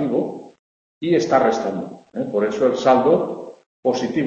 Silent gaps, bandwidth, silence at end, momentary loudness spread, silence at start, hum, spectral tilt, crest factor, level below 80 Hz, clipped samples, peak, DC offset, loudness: 0.59-1.01 s, 3.66-3.83 s; 8 kHz; 0 s; 15 LU; 0 s; none; -6 dB/octave; 18 dB; -60 dBFS; under 0.1%; -2 dBFS; under 0.1%; -20 LUFS